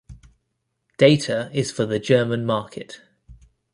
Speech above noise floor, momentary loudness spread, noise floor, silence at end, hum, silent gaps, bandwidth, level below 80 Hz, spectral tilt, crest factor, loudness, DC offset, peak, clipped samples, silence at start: 55 dB; 18 LU; -75 dBFS; 0.4 s; none; none; 11.5 kHz; -54 dBFS; -5.5 dB/octave; 20 dB; -20 LUFS; under 0.1%; -2 dBFS; under 0.1%; 0.1 s